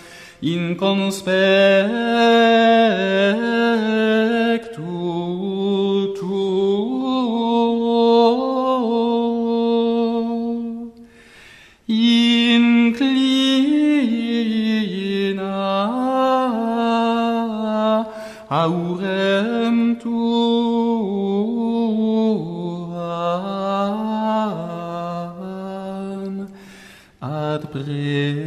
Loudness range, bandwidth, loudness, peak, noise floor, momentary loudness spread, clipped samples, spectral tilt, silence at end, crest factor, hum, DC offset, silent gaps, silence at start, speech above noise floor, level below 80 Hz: 8 LU; 11 kHz; -19 LUFS; -4 dBFS; -46 dBFS; 13 LU; under 0.1%; -6 dB/octave; 0 s; 16 dB; none; under 0.1%; none; 0 s; 31 dB; -60 dBFS